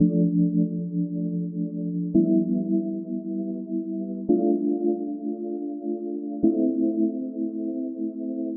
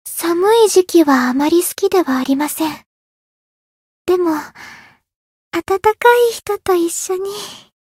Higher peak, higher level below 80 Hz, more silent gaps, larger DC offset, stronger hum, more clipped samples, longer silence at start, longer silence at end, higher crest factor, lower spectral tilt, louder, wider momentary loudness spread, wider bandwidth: second, -8 dBFS vs 0 dBFS; second, -64 dBFS vs -56 dBFS; second, none vs 2.86-4.05 s, 5.16-5.51 s; neither; neither; neither; about the same, 0 s vs 0.05 s; second, 0 s vs 0.25 s; about the same, 16 dB vs 16 dB; first, -17.5 dB/octave vs -2.5 dB/octave; second, -26 LUFS vs -15 LUFS; second, 9 LU vs 13 LU; second, 0.9 kHz vs 16.5 kHz